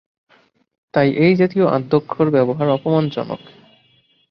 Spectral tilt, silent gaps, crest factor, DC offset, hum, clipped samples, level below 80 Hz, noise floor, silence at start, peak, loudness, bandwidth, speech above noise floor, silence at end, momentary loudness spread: -9.5 dB/octave; none; 16 dB; under 0.1%; none; under 0.1%; -58 dBFS; -58 dBFS; 0.95 s; -2 dBFS; -17 LUFS; 6.2 kHz; 42 dB; 0.95 s; 10 LU